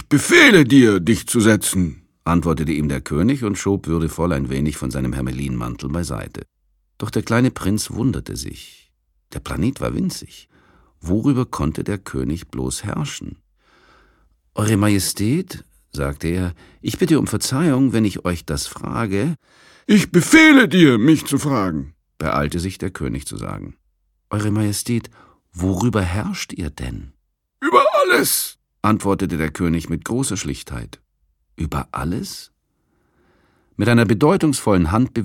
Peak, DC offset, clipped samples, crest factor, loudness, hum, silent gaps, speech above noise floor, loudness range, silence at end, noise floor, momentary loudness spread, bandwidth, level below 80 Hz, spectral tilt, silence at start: 0 dBFS; under 0.1%; under 0.1%; 18 dB; -18 LUFS; none; none; 48 dB; 10 LU; 0 s; -66 dBFS; 17 LU; 17 kHz; -38 dBFS; -5 dB/octave; 0 s